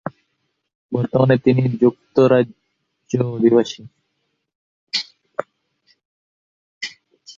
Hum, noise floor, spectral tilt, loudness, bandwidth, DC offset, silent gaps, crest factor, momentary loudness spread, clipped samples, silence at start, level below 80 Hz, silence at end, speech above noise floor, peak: none; -72 dBFS; -7 dB/octave; -18 LUFS; 7.6 kHz; under 0.1%; 0.75-0.89 s, 4.55-4.87 s, 6.05-6.81 s; 18 dB; 16 LU; under 0.1%; 0.05 s; -58 dBFS; 0.05 s; 56 dB; -2 dBFS